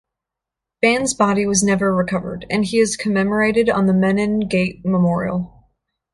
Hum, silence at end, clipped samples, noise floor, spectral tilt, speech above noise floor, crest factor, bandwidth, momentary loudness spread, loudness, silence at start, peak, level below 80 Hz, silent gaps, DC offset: none; 0.65 s; under 0.1%; -85 dBFS; -5 dB/octave; 67 dB; 16 dB; 11.5 kHz; 7 LU; -18 LUFS; 0.8 s; -2 dBFS; -48 dBFS; none; under 0.1%